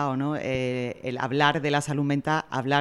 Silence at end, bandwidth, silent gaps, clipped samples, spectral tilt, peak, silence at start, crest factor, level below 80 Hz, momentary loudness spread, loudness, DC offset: 0 s; 12 kHz; none; under 0.1%; -5.5 dB/octave; -6 dBFS; 0 s; 20 dB; -58 dBFS; 7 LU; -26 LUFS; under 0.1%